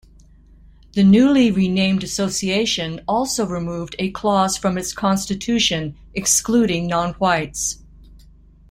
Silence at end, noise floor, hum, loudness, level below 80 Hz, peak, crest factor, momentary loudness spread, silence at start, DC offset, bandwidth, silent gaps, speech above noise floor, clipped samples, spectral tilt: 0.55 s; -47 dBFS; none; -19 LUFS; -44 dBFS; -4 dBFS; 16 dB; 10 LU; 0.95 s; under 0.1%; 16 kHz; none; 29 dB; under 0.1%; -4 dB/octave